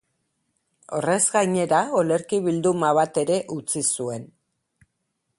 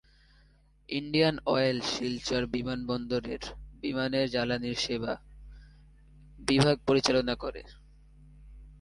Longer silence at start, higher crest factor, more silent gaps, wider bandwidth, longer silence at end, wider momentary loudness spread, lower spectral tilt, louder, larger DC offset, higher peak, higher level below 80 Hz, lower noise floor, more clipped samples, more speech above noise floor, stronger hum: about the same, 0.9 s vs 0.9 s; second, 18 dB vs 26 dB; neither; about the same, 11.5 kHz vs 11.5 kHz; first, 1.1 s vs 0 s; second, 8 LU vs 13 LU; about the same, -4.5 dB/octave vs -5 dB/octave; first, -22 LUFS vs -29 LUFS; neither; about the same, -6 dBFS vs -6 dBFS; second, -68 dBFS vs -52 dBFS; first, -76 dBFS vs -62 dBFS; neither; first, 54 dB vs 33 dB; neither